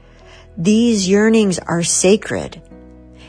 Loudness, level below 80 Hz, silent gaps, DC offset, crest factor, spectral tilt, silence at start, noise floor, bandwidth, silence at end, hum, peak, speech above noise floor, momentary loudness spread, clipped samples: -15 LUFS; -44 dBFS; none; under 0.1%; 16 dB; -4.5 dB/octave; 0.55 s; -42 dBFS; 10.5 kHz; 0.5 s; none; -2 dBFS; 27 dB; 12 LU; under 0.1%